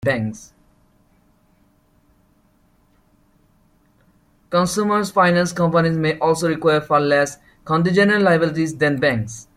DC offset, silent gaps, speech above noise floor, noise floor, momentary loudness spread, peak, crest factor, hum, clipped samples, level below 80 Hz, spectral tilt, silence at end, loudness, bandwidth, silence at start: under 0.1%; none; 41 dB; -58 dBFS; 8 LU; -4 dBFS; 16 dB; none; under 0.1%; -54 dBFS; -5.5 dB/octave; 0.15 s; -18 LUFS; 15 kHz; 0 s